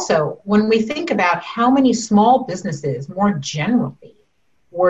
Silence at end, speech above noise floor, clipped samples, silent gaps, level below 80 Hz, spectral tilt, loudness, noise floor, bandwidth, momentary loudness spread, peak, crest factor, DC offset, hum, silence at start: 0 s; 48 dB; under 0.1%; none; -54 dBFS; -5.5 dB/octave; -17 LUFS; -65 dBFS; 8.4 kHz; 10 LU; -4 dBFS; 14 dB; 0.1%; none; 0 s